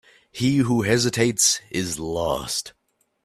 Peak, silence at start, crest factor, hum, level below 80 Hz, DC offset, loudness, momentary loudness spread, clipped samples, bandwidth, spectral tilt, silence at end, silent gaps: -4 dBFS; 0.35 s; 18 dB; none; -50 dBFS; under 0.1%; -22 LUFS; 10 LU; under 0.1%; 15.5 kHz; -3.5 dB/octave; 0.55 s; none